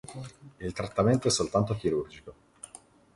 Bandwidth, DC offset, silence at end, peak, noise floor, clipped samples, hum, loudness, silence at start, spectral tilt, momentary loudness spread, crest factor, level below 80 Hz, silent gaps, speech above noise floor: 11.5 kHz; under 0.1%; 0.85 s; -12 dBFS; -54 dBFS; under 0.1%; none; -28 LUFS; 0.1 s; -5 dB/octave; 21 LU; 18 dB; -54 dBFS; none; 25 dB